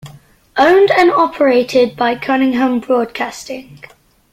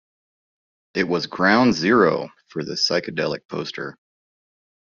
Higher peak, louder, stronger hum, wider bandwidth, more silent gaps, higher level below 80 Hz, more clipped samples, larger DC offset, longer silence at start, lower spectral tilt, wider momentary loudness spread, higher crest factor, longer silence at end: about the same, 0 dBFS vs -2 dBFS; first, -13 LUFS vs -20 LUFS; neither; first, 15 kHz vs 7.4 kHz; second, none vs 3.45-3.49 s; first, -52 dBFS vs -60 dBFS; neither; neither; second, 0.05 s vs 0.95 s; first, -4.5 dB/octave vs -3 dB/octave; about the same, 13 LU vs 15 LU; second, 14 dB vs 20 dB; second, 0.55 s vs 0.9 s